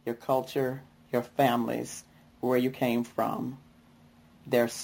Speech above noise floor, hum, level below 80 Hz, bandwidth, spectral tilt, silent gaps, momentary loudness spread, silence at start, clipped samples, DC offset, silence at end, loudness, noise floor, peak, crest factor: 29 dB; none; -68 dBFS; 17 kHz; -5.5 dB/octave; none; 13 LU; 0.05 s; under 0.1%; under 0.1%; 0 s; -30 LUFS; -58 dBFS; -10 dBFS; 20 dB